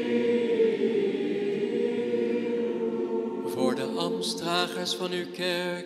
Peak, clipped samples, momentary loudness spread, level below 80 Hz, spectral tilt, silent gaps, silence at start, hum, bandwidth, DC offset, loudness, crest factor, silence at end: -10 dBFS; under 0.1%; 5 LU; -78 dBFS; -4.5 dB/octave; none; 0 s; none; 13.5 kHz; under 0.1%; -28 LUFS; 16 dB; 0 s